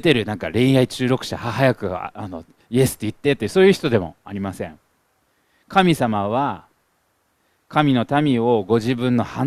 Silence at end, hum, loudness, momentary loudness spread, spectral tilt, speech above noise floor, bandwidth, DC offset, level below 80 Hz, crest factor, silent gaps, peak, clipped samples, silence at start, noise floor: 0 s; none; -19 LUFS; 14 LU; -6 dB/octave; 47 dB; 15.5 kHz; under 0.1%; -52 dBFS; 20 dB; none; 0 dBFS; under 0.1%; 0.05 s; -66 dBFS